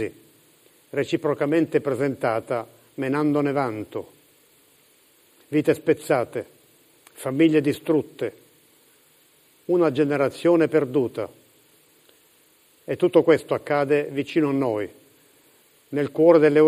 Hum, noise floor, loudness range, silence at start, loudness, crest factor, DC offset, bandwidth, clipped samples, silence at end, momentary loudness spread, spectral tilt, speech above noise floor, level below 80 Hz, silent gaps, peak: none; -58 dBFS; 4 LU; 0 s; -22 LUFS; 20 dB; under 0.1%; 15.5 kHz; under 0.1%; 0 s; 14 LU; -7 dB/octave; 37 dB; -68 dBFS; none; -4 dBFS